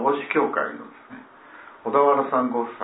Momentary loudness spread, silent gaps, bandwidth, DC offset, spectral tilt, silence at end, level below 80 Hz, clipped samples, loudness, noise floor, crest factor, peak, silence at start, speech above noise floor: 24 LU; none; 4 kHz; under 0.1%; -9.5 dB/octave; 0 s; -76 dBFS; under 0.1%; -22 LUFS; -46 dBFS; 18 dB; -6 dBFS; 0 s; 23 dB